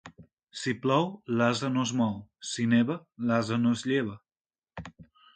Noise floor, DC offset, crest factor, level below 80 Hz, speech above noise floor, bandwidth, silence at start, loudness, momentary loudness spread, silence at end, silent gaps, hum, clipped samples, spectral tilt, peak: under -90 dBFS; under 0.1%; 18 dB; -64 dBFS; over 62 dB; 9.2 kHz; 0.05 s; -28 LUFS; 19 LU; 0.3 s; 0.33-0.37 s, 0.43-0.47 s, 4.41-4.45 s; none; under 0.1%; -5.5 dB/octave; -10 dBFS